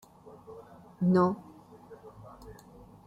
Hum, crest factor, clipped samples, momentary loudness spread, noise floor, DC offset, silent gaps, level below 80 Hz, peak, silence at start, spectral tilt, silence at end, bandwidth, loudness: none; 18 dB; under 0.1%; 27 LU; -53 dBFS; under 0.1%; none; -64 dBFS; -16 dBFS; 0.5 s; -9.5 dB/octave; 0.55 s; 8 kHz; -28 LUFS